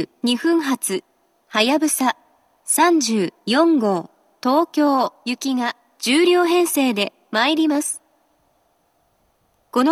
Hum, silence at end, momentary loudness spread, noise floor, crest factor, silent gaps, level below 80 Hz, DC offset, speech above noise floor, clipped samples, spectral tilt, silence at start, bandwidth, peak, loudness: none; 0 s; 10 LU; -64 dBFS; 18 dB; none; -78 dBFS; under 0.1%; 46 dB; under 0.1%; -3 dB/octave; 0 s; 14.5 kHz; -2 dBFS; -19 LUFS